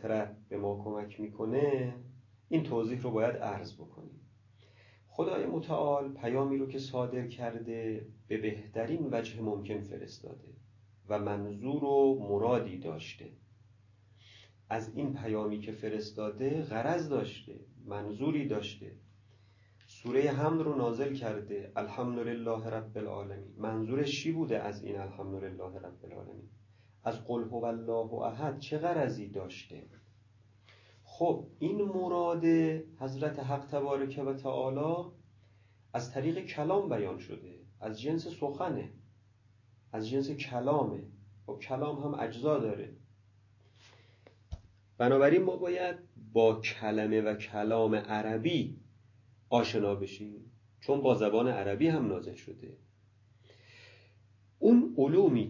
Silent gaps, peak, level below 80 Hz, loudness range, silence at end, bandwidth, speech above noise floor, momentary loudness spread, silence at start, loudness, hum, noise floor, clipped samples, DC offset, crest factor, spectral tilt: none; -12 dBFS; -66 dBFS; 7 LU; 0 s; 7.4 kHz; 32 dB; 18 LU; 0 s; -33 LUFS; none; -64 dBFS; under 0.1%; under 0.1%; 22 dB; -7.5 dB/octave